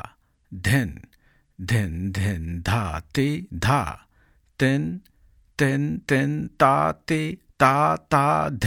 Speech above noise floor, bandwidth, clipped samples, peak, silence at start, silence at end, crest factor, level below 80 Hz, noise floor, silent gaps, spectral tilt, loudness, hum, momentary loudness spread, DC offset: 38 dB; 17 kHz; under 0.1%; -2 dBFS; 0.05 s; 0 s; 22 dB; -46 dBFS; -60 dBFS; none; -6 dB/octave; -23 LUFS; none; 13 LU; under 0.1%